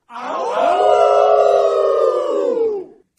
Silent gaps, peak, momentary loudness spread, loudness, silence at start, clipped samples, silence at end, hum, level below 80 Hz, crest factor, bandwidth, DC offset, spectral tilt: none; -2 dBFS; 10 LU; -15 LUFS; 0.1 s; under 0.1%; 0.35 s; none; -64 dBFS; 14 dB; 10.5 kHz; under 0.1%; -3.5 dB/octave